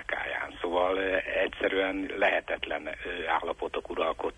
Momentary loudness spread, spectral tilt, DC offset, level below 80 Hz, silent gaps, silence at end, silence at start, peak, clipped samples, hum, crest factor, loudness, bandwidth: 7 LU; -4.5 dB/octave; under 0.1%; -54 dBFS; none; 0 s; 0 s; -14 dBFS; under 0.1%; none; 18 dB; -30 LUFS; 10.5 kHz